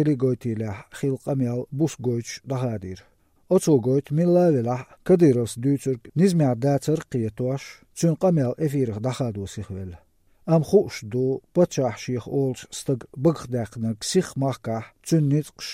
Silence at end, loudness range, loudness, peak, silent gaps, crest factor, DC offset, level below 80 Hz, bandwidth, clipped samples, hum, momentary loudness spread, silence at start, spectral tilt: 0 s; 5 LU; -24 LUFS; -6 dBFS; none; 18 dB; under 0.1%; -56 dBFS; 15.5 kHz; under 0.1%; none; 12 LU; 0 s; -7 dB/octave